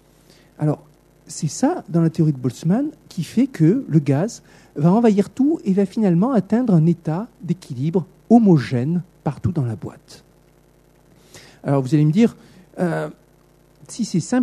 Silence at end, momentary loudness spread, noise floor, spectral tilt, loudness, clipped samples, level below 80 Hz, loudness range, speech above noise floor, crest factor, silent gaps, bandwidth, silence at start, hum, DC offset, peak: 0 s; 12 LU; -54 dBFS; -8 dB/octave; -19 LUFS; under 0.1%; -56 dBFS; 5 LU; 35 dB; 18 dB; none; 12.5 kHz; 0.6 s; 60 Hz at -40 dBFS; under 0.1%; -2 dBFS